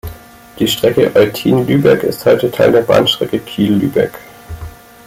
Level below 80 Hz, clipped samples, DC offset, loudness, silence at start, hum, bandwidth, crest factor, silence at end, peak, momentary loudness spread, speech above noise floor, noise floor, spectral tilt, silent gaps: -40 dBFS; under 0.1%; under 0.1%; -12 LUFS; 0.05 s; none; 16.5 kHz; 12 dB; 0.35 s; 0 dBFS; 19 LU; 21 dB; -33 dBFS; -5.5 dB/octave; none